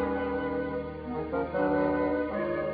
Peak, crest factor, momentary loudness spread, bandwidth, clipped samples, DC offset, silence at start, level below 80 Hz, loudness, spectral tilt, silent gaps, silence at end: -16 dBFS; 14 dB; 8 LU; 5 kHz; under 0.1%; under 0.1%; 0 s; -50 dBFS; -30 LUFS; -6 dB/octave; none; 0 s